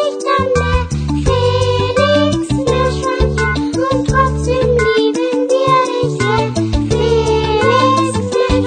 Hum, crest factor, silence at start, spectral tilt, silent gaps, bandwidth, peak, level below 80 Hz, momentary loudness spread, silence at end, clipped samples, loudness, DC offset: none; 14 dB; 0 s; -5.5 dB/octave; none; 9.4 kHz; 0 dBFS; -26 dBFS; 4 LU; 0 s; under 0.1%; -14 LUFS; under 0.1%